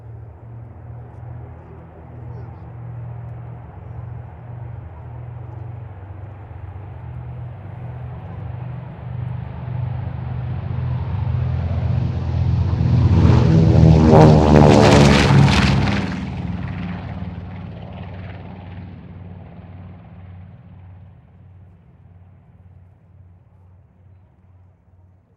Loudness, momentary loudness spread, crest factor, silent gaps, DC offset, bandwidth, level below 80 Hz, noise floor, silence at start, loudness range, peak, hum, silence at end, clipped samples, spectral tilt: -16 LUFS; 27 LU; 20 dB; none; under 0.1%; 10.5 kHz; -34 dBFS; -51 dBFS; 0.05 s; 23 LU; 0 dBFS; none; 4.4 s; under 0.1%; -7 dB/octave